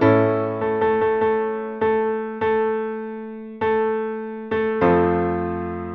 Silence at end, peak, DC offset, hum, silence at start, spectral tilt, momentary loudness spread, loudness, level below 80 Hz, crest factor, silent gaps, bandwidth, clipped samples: 0 s; -4 dBFS; under 0.1%; none; 0 s; -9.5 dB/octave; 10 LU; -21 LUFS; -50 dBFS; 16 dB; none; 4.6 kHz; under 0.1%